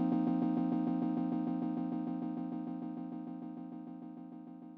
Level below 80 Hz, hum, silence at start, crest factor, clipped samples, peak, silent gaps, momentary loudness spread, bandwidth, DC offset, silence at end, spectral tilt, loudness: -74 dBFS; none; 0 s; 14 dB; under 0.1%; -22 dBFS; none; 15 LU; 4.4 kHz; under 0.1%; 0 s; -9.5 dB/octave; -37 LUFS